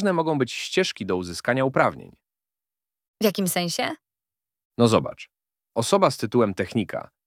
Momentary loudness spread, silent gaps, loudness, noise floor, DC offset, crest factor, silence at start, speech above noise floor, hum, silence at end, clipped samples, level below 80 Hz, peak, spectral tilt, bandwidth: 12 LU; 3.08-3.14 s, 4.65-4.70 s; -23 LUFS; under -90 dBFS; under 0.1%; 22 dB; 0 s; over 67 dB; none; 0.25 s; under 0.1%; -62 dBFS; -4 dBFS; -5 dB/octave; 17 kHz